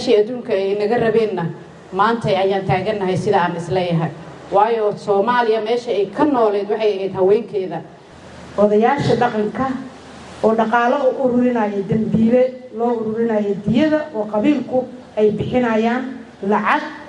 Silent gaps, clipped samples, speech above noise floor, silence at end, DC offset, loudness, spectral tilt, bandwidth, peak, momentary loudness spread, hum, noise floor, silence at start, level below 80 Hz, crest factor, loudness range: none; under 0.1%; 22 dB; 0 s; under 0.1%; -18 LUFS; -7 dB/octave; 10 kHz; -2 dBFS; 9 LU; none; -39 dBFS; 0 s; -52 dBFS; 16 dB; 2 LU